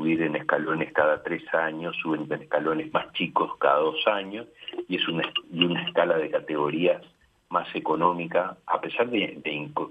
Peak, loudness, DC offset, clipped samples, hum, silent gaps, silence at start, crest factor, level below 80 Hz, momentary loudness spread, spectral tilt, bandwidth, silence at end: -6 dBFS; -26 LUFS; under 0.1%; under 0.1%; none; none; 0 s; 20 dB; -70 dBFS; 7 LU; -7 dB/octave; 5 kHz; 0 s